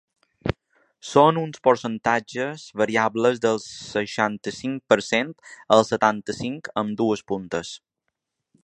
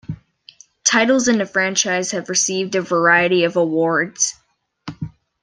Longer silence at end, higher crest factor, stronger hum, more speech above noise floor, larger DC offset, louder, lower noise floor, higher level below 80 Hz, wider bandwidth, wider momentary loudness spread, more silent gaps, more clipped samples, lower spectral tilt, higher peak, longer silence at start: first, 0.85 s vs 0.35 s; about the same, 22 dB vs 18 dB; neither; first, 57 dB vs 31 dB; neither; second, -23 LUFS vs -17 LUFS; first, -80 dBFS vs -48 dBFS; about the same, -56 dBFS vs -56 dBFS; about the same, 10.5 kHz vs 10.5 kHz; second, 12 LU vs 19 LU; neither; neither; first, -5 dB/octave vs -2.5 dB/octave; about the same, 0 dBFS vs -2 dBFS; first, 0.45 s vs 0.1 s